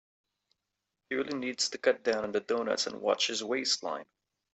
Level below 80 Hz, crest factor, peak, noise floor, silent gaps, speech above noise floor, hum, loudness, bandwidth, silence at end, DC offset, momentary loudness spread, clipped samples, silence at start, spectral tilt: -76 dBFS; 20 dB; -12 dBFS; -86 dBFS; none; 54 dB; none; -31 LUFS; 8.2 kHz; 0.5 s; under 0.1%; 7 LU; under 0.1%; 1.1 s; -1.5 dB/octave